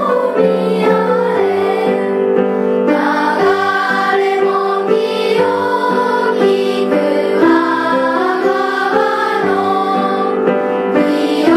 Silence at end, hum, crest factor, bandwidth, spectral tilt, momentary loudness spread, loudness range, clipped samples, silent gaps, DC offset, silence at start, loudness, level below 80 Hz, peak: 0 s; none; 12 dB; 14 kHz; -6 dB/octave; 2 LU; 1 LU; under 0.1%; none; under 0.1%; 0 s; -14 LUFS; -58 dBFS; 0 dBFS